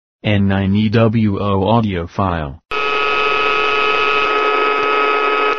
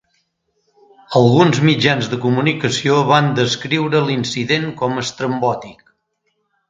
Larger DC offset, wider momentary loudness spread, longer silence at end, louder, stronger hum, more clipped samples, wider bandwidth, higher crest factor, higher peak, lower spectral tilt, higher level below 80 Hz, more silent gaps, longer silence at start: neither; about the same, 6 LU vs 8 LU; second, 0 s vs 0.95 s; about the same, -15 LUFS vs -16 LUFS; neither; neither; second, 7.2 kHz vs 9.4 kHz; about the same, 16 dB vs 16 dB; about the same, 0 dBFS vs 0 dBFS; second, -4 dB/octave vs -5.5 dB/octave; first, -42 dBFS vs -56 dBFS; neither; second, 0.2 s vs 1.1 s